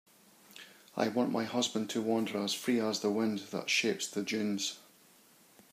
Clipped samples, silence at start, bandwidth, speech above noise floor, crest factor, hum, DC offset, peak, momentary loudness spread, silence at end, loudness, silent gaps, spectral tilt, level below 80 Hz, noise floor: under 0.1%; 0.5 s; 15.5 kHz; 30 dB; 20 dB; none; under 0.1%; -16 dBFS; 17 LU; 0.9 s; -33 LUFS; none; -3.5 dB/octave; -84 dBFS; -62 dBFS